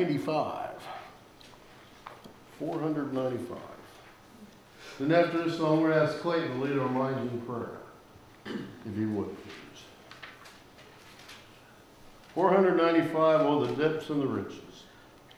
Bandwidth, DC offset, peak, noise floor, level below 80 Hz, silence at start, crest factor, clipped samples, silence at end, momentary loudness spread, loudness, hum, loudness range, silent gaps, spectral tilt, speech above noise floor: 19.5 kHz; under 0.1%; -10 dBFS; -55 dBFS; -66 dBFS; 0 s; 20 dB; under 0.1%; 0.55 s; 25 LU; -29 LUFS; none; 12 LU; none; -7 dB/octave; 26 dB